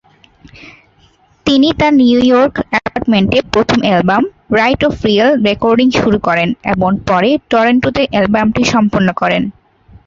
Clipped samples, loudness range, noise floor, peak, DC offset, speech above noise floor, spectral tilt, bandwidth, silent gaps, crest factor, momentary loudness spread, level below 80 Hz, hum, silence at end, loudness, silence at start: under 0.1%; 1 LU; -50 dBFS; 0 dBFS; under 0.1%; 39 dB; -6 dB/octave; 7.6 kHz; none; 12 dB; 5 LU; -38 dBFS; none; 0.55 s; -12 LUFS; 0.65 s